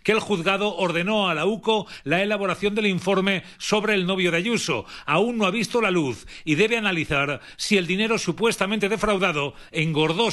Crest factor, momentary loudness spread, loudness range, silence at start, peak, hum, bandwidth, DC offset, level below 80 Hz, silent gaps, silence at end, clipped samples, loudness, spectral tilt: 18 dB; 5 LU; 1 LU; 0.05 s; -6 dBFS; none; 12.5 kHz; under 0.1%; -50 dBFS; none; 0 s; under 0.1%; -22 LUFS; -4.5 dB/octave